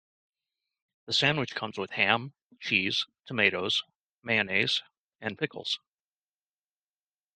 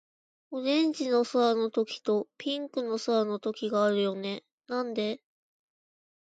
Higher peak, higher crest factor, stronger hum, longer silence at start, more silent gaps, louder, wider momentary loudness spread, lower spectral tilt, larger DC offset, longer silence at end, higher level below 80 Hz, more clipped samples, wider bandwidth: first, -6 dBFS vs -14 dBFS; first, 26 dB vs 16 dB; first, 50 Hz at -60 dBFS vs none; first, 1.05 s vs 0.5 s; first, 2.42-2.50 s, 3.96-4.18 s, 4.97-5.09 s vs 4.52-4.58 s; about the same, -28 LUFS vs -29 LUFS; about the same, 11 LU vs 10 LU; second, -3.5 dB/octave vs -5 dB/octave; neither; first, 1.6 s vs 1.15 s; first, -72 dBFS vs -82 dBFS; neither; first, 13 kHz vs 9.2 kHz